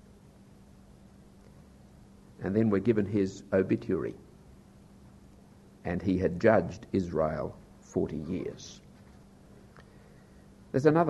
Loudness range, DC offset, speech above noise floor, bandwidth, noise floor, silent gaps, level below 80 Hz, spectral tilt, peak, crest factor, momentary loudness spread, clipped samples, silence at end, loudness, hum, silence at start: 6 LU; under 0.1%; 27 dB; 12 kHz; -55 dBFS; none; -56 dBFS; -8 dB/octave; -8 dBFS; 24 dB; 16 LU; under 0.1%; 0 s; -30 LUFS; none; 2.4 s